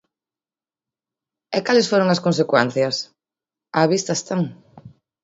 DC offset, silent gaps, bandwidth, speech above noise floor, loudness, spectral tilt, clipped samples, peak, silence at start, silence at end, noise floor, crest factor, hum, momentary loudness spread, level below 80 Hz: under 0.1%; none; 8 kHz; over 71 dB; -20 LUFS; -4.5 dB/octave; under 0.1%; 0 dBFS; 1.5 s; 0.35 s; under -90 dBFS; 22 dB; none; 9 LU; -66 dBFS